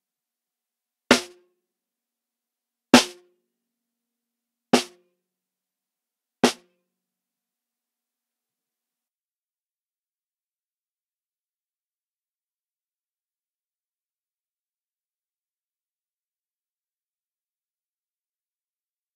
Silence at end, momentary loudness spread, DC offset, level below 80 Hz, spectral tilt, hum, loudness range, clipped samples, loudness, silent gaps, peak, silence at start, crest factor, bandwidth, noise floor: 12.65 s; 16 LU; under 0.1%; -66 dBFS; -2.5 dB/octave; none; 8 LU; under 0.1%; -21 LUFS; none; -2 dBFS; 1.1 s; 30 dB; 15.5 kHz; under -90 dBFS